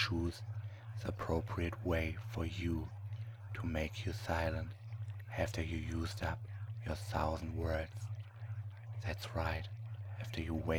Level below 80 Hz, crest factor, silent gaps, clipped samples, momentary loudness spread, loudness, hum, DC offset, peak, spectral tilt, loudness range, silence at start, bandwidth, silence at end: -50 dBFS; 20 dB; none; under 0.1%; 9 LU; -41 LUFS; none; under 0.1%; -20 dBFS; -6.5 dB/octave; 2 LU; 0 s; 19 kHz; 0 s